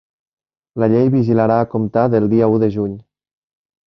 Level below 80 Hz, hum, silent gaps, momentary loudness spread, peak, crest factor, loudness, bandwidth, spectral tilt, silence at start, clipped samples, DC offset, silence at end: -50 dBFS; none; none; 10 LU; -2 dBFS; 16 dB; -16 LUFS; 6 kHz; -11 dB/octave; 0.75 s; under 0.1%; under 0.1%; 0.85 s